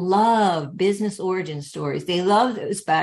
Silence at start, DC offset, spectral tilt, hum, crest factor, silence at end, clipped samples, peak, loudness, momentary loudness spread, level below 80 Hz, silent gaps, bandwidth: 0 s; under 0.1%; -5 dB/octave; none; 14 dB; 0 s; under 0.1%; -6 dBFS; -22 LUFS; 10 LU; -66 dBFS; none; 12.5 kHz